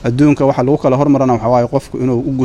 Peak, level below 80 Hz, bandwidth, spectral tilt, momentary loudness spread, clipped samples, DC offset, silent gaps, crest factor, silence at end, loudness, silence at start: 0 dBFS; -40 dBFS; 10.5 kHz; -8.5 dB/octave; 6 LU; under 0.1%; under 0.1%; none; 12 dB; 0 s; -13 LUFS; 0 s